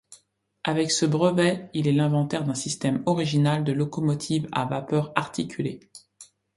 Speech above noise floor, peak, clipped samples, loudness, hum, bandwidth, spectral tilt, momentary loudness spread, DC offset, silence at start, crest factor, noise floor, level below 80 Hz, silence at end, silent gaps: 36 dB; -2 dBFS; under 0.1%; -25 LUFS; none; 11.5 kHz; -5.5 dB/octave; 8 LU; under 0.1%; 0.1 s; 24 dB; -60 dBFS; -62 dBFS; 0.3 s; none